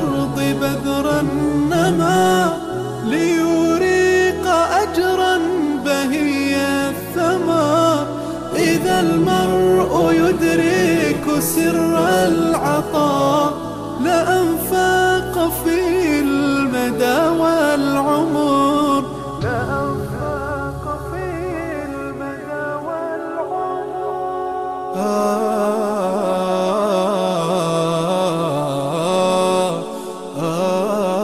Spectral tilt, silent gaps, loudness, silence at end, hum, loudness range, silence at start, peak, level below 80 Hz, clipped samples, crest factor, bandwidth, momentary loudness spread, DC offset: -5 dB/octave; none; -18 LUFS; 0 s; none; 8 LU; 0 s; -6 dBFS; -42 dBFS; under 0.1%; 12 dB; 15.5 kHz; 9 LU; under 0.1%